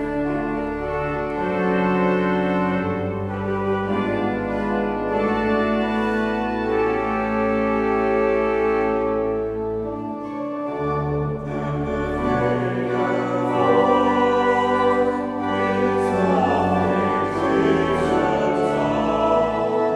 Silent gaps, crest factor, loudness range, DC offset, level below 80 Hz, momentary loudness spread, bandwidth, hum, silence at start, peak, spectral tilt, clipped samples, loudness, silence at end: none; 16 dB; 4 LU; under 0.1%; -42 dBFS; 7 LU; 11 kHz; none; 0 s; -6 dBFS; -7.5 dB/octave; under 0.1%; -21 LUFS; 0 s